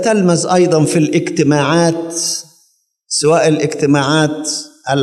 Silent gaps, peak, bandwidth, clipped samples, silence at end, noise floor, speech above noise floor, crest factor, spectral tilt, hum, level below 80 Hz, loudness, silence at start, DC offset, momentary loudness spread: none; 0 dBFS; 13.5 kHz; under 0.1%; 0 s; -58 dBFS; 45 dB; 14 dB; -4.5 dB/octave; none; -66 dBFS; -14 LUFS; 0 s; under 0.1%; 8 LU